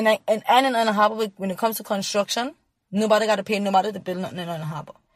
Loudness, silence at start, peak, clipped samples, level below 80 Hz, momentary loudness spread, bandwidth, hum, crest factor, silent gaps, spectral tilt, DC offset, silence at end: -22 LUFS; 0 s; -4 dBFS; under 0.1%; -70 dBFS; 12 LU; 15.5 kHz; none; 18 dB; none; -4 dB/octave; under 0.1%; 0.25 s